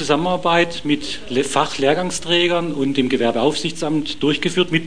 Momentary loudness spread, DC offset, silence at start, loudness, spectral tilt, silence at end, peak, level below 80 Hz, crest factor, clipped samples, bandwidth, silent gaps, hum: 5 LU; 3%; 0 s; -19 LUFS; -4.5 dB/octave; 0 s; 0 dBFS; -48 dBFS; 18 dB; under 0.1%; 10.5 kHz; none; none